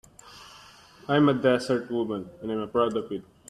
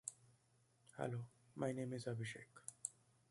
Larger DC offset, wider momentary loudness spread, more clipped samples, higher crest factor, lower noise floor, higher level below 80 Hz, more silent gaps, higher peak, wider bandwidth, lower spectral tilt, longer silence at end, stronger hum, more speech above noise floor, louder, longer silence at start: neither; first, 24 LU vs 11 LU; neither; second, 18 dB vs 26 dB; second, -51 dBFS vs -77 dBFS; first, -62 dBFS vs -82 dBFS; neither; first, -10 dBFS vs -24 dBFS; about the same, 12.5 kHz vs 11.5 kHz; first, -6.5 dB/octave vs -5 dB/octave; about the same, 0.3 s vs 0.4 s; neither; second, 26 dB vs 31 dB; first, -26 LUFS vs -48 LUFS; first, 0.25 s vs 0.05 s